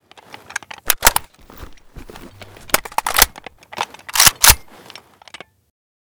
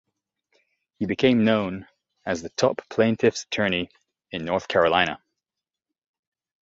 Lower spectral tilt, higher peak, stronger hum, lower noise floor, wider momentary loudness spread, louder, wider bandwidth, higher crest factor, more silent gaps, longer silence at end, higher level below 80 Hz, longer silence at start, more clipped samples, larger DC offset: second, 0 dB/octave vs -5 dB/octave; about the same, 0 dBFS vs -2 dBFS; neither; second, -42 dBFS vs -88 dBFS; first, 20 LU vs 16 LU; first, -14 LUFS vs -23 LUFS; first, over 20 kHz vs 7.8 kHz; about the same, 20 dB vs 22 dB; neither; about the same, 1.55 s vs 1.5 s; first, -34 dBFS vs -56 dBFS; second, 0.85 s vs 1 s; first, 0.2% vs under 0.1%; neither